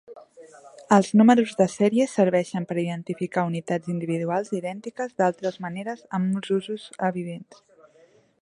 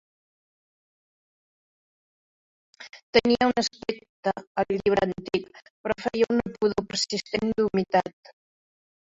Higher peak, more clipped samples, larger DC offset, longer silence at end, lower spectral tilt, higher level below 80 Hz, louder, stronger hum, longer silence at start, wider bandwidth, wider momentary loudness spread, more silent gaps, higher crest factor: about the same, -2 dBFS vs -4 dBFS; neither; neither; about the same, 1 s vs 1.1 s; first, -6.5 dB/octave vs -4.5 dB/octave; second, -70 dBFS vs -58 dBFS; about the same, -24 LUFS vs -26 LUFS; neither; second, 0.1 s vs 2.8 s; first, 11 kHz vs 8.4 kHz; first, 14 LU vs 11 LU; second, none vs 3.03-3.13 s, 4.09-4.23 s, 4.47-4.55 s, 5.70-5.84 s; about the same, 22 dB vs 22 dB